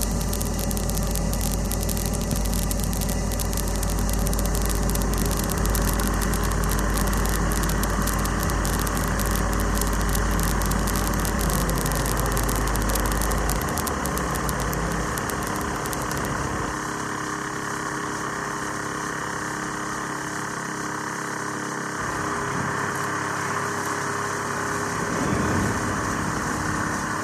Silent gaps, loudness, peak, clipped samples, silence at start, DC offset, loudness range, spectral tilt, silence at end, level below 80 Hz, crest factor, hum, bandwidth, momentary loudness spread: none; -25 LUFS; -2 dBFS; under 0.1%; 0 s; under 0.1%; 4 LU; -4 dB/octave; 0 s; -30 dBFS; 22 dB; none; 14 kHz; 5 LU